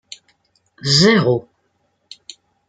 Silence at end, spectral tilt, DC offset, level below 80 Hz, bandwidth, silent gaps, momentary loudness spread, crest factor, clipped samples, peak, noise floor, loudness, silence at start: 1.25 s; -4.5 dB/octave; under 0.1%; -58 dBFS; 9.4 kHz; none; 26 LU; 18 dB; under 0.1%; 0 dBFS; -66 dBFS; -15 LUFS; 0.85 s